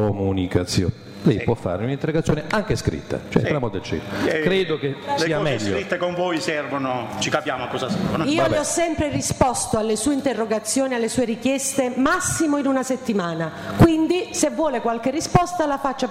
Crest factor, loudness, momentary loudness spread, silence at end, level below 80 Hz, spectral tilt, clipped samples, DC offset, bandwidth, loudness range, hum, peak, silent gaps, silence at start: 16 dB; -22 LUFS; 5 LU; 0 s; -42 dBFS; -5 dB/octave; under 0.1%; under 0.1%; 16 kHz; 3 LU; none; -6 dBFS; none; 0 s